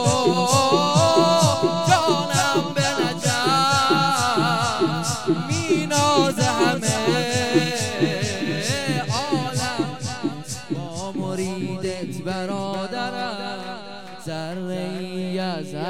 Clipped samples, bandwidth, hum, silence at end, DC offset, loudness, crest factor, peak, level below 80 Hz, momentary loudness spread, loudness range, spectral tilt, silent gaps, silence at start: under 0.1%; 17.5 kHz; none; 0 s; 0.8%; -21 LUFS; 18 dB; -4 dBFS; -56 dBFS; 12 LU; 10 LU; -4 dB/octave; none; 0 s